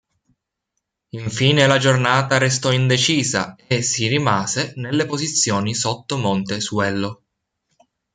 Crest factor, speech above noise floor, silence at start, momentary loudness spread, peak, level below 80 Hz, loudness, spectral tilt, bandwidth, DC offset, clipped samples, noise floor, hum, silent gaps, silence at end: 18 dB; 59 dB; 1.15 s; 8 LU; -2 dBFS; -58 dBFS; -18 LUFS; -4 dB/octave; 9.6 kHz; under 0.1%; under 0.1%; -78 dBFS; none; none; 1 s